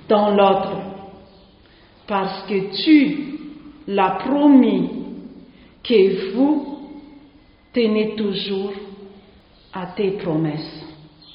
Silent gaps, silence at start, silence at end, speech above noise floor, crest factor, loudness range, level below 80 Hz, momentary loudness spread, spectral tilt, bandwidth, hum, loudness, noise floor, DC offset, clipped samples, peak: none; 0.1 s; 0.4 s; 33 dB; 20 dB; 7 LU; -56 dBFS; 21 LU; -4.5 dB/octave; 5.4 kHz; none; -19 LUFS; -50 dBFS; under 0.1%; under 0.1%; 0 dBFS